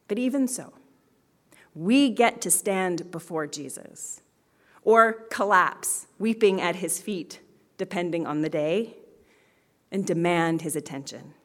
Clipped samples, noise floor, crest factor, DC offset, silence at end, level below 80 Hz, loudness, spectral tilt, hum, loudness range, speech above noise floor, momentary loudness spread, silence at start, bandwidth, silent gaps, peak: under 0.1%; -65 dBFS; 24 dB; under 0.1%; 0.15 s; -74 dBFS; -25 LUFS; -4 dB/octave; none; 5 LU; 40 dB; 16 LU; 0.1 s; 18 kHz; none; -4 dBFS